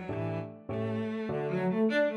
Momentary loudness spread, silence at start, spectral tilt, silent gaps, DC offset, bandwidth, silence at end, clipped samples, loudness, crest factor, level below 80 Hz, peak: 9 LU; 0 s; -8 dB/octave; none; under 0.1%; 10 kHz; 0 s; under 0.1%; -32 LUFS; 12 dB; -64 dBFS; -18 dBFS